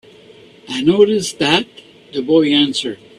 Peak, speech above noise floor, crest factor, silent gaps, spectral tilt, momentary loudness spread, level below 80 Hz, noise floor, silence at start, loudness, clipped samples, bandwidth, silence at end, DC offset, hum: 0 dBFS; 28 dB; 16 dB; none; -4.5 dB/octave; 13 LU; -56 dBFS; -43 dBFS; 0.65 s; -15 LUFS; under 0.1%; 13 kHz; 0.25 s; under 0.1%; none